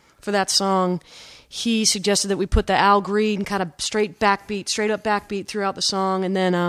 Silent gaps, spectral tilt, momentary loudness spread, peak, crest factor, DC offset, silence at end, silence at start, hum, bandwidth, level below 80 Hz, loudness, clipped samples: none; -3.5 dB/octave; 7 LU; -2 dBFS; 20 dB; under 0.1%; 0 s; 0.25 s; none; 14.5 kHz; -36 dBFS; -21 LUFS; under 0.1%